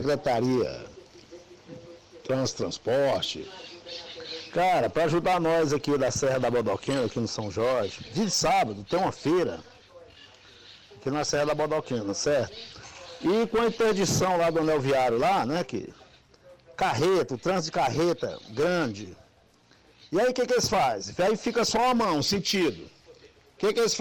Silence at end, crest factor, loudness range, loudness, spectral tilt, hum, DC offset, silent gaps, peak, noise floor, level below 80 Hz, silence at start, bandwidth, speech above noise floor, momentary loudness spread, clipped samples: 0 s; 10 dB; 5 LU; -26 LUFS; -4.5 dB/octave; none; under 0.1%; none; -16 dBFS; -60 dBFS; -56 dBFS; 0 s; 16.5 kHz; 34 dB; 15 LU; under 0.1%